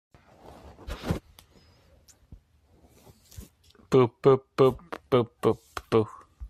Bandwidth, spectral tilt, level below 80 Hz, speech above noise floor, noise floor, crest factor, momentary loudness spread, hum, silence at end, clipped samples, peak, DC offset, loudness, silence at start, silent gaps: 14 kHz; -7.5 dB/octave; -50 dBFS; 38 dB; -61 dBFS; 20 dB; 18 LU; none; 0 s; under 0.1%; -8 dBFS; under 0.1%; -26 LUFS; 0.85 s; none